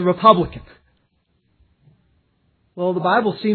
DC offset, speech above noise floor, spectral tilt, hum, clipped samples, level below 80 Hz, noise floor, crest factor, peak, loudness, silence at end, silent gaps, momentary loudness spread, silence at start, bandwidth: under 0.1%; 49 dB; -9.5 dB/octave; none; under 0.1%; -50 dBFS; -66 dBFS; 20 dB; 0 dBFS; -17 LUFS; 0 s; none; 13 LU; 0 s; 4.5 kHz